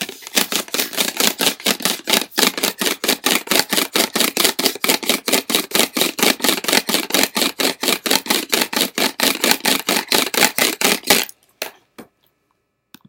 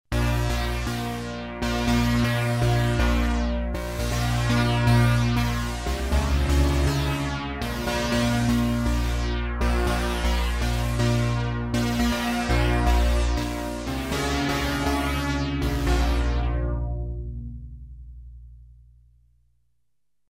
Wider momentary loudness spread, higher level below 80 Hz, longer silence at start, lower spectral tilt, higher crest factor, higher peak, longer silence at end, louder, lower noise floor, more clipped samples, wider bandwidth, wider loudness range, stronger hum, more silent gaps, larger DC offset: second, 4 LU vs 8 LU; second, -62 dBFS vs -28 dBFS; about the same, 0 s vs 0.1 s; second, -1 dB/octave vs -5.5 dB/octave; about the same, 20 dB vs 16 dB; first, 0 dBFS vs -8 dBFS; second, 1.05 s vs 1.65 s; first, -16 LUFS vs -25 LUFS; second, -69 dBFS vs -81 dBFS; neither; first, over 20 kHz vs 16 kHz; second, 1 LU vs 6 LU; second, none vs 60 Hz at -35 dBFS; neither; neither